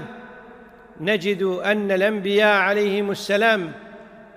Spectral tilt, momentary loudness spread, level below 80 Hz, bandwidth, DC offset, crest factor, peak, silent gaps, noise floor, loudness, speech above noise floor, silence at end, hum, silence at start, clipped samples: -5 dB/octave; 16 LU; -64 dBFS; 16 kHz; under 0.1%; 16 dB; -6 dBFS; none; -45 dBFS; -20 LUFS; 25 dB; 0.1 s; none; 0 s; under 0.1%